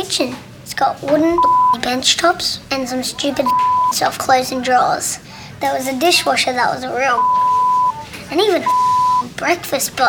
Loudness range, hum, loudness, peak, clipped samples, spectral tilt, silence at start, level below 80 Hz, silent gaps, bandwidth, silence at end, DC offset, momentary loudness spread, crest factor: 1 LU; none; -16 LUFS; -2 dBFS; under 0.1%; -2.5 dB/octave; 0 s; -50 dBFS; none; over 20 kHz; 0 s; under 0.1%; 8 LU; 14 dB